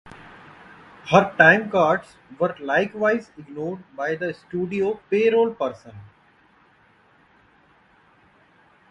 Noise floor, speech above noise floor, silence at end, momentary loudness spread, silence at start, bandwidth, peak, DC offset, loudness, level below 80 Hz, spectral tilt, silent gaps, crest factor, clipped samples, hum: -57 dBFS; 36 dB; 2.85 s; 17 LU; 0.05 s; 10.5 kHz; 0 dBFS; under 0.1%; -21 LUFS; -62 dBFS; -6 dB/octave; none; 24 dB; under 0.1%; none